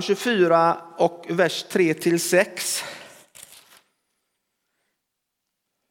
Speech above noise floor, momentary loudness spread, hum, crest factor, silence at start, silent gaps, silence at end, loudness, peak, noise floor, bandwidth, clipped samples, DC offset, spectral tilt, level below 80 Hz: 59 dB; 8 LU; none; 20 dB; 0 s; none; 2.5 s; -21 LUFS; -4 dBFS; -80 dBFS; 17.5 kHz; under 0.1%; under 0.1%; -4 dB/octave; -78 dBFS